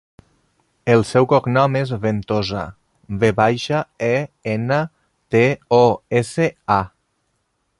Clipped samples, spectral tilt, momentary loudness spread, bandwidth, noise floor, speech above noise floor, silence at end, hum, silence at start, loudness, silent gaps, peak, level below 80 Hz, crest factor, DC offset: under 0.1%; -6.5 dB/octave; 10 LU; 11.5 kHz; -69 dBFS; 52 dB; 0.9 s; none; 0.85 s; -18 LUFS; none; -2 dBFS; -48 dBFS; 18 dB; under 0.1%